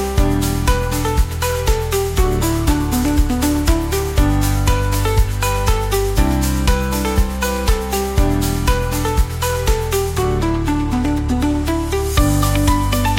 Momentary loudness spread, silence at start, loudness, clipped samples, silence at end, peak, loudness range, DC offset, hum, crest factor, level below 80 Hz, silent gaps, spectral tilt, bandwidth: 3 LU; 0 s; -18 LUFS; under 0.1%; 0 s; -2 dBFS; 1 LU; under 0.1%; none; 14 dB; -20 dBFS; none; -5.5 dB/octave; 17 kHz